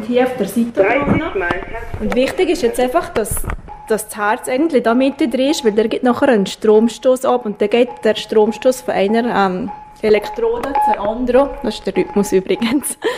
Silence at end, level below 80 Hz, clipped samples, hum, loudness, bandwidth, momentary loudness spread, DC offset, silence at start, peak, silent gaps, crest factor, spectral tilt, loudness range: 0 s; -36 dBFS; under 0.1%; none; -16 LUFS; 15.5 kHz; 7 LU; under 0.1%; 0 s; -2 dBFS; none; 14 dB; -5 dB/octave; 3 LU